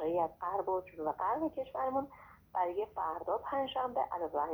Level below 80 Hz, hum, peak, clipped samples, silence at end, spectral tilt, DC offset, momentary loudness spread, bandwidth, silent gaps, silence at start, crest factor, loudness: -66 dBFS; none; -22 dBFS; under 0.1%; 0 s; -7 dB/octave; under 0.1%; 4 LU; over 20 kHz; none; 0 s; 14 dB; -36 LUFS